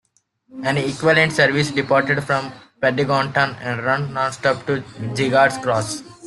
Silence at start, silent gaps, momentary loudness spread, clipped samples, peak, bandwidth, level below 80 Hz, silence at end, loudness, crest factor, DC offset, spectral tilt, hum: 0.55 s; none; 9 LU; under 0.1%; -2 dBFS; 12.5 kHz; -56 dBFS; 0 s; -19 LUFS; 18 dB; under 0.1%; -5 dB/octave; none